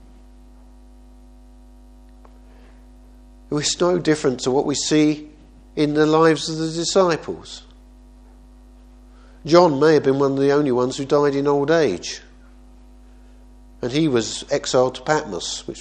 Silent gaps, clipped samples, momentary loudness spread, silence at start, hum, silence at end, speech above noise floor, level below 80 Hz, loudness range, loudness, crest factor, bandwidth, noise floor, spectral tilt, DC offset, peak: none; under 0.1%; 14 LU; 3.5 s; 50 Hz at -45 dBFS; 0 s; 27 dB; -48 dBFS; 6 LU; -19 LUFS; 22 dB; 10 kHz; -45 dBFS; -4.5 dB/octave; under 0.1%; 0 dBFS